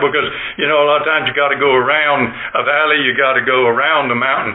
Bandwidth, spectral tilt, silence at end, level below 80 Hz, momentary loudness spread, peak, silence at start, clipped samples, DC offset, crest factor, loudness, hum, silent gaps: 4.1 kHz; -8.5 dB/octave; 0 s; -54 dBFS; 5 LU; -2 dBFS; 0 s; under 0.1%; under 0.1%; 12 dB; -13 LUFS; none; none